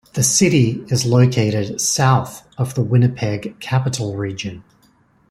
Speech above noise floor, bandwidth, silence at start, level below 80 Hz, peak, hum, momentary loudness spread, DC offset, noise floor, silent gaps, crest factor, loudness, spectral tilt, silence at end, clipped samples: 39 dB; 14 kHz; 0.15 s; -52 dBFS; -2 dBFS; none; 11 LU; under 0.1%; -56 dBFS; none; 16 dB; -17 LUFS; -5 dB/octave; 0.7 s; under 0.1%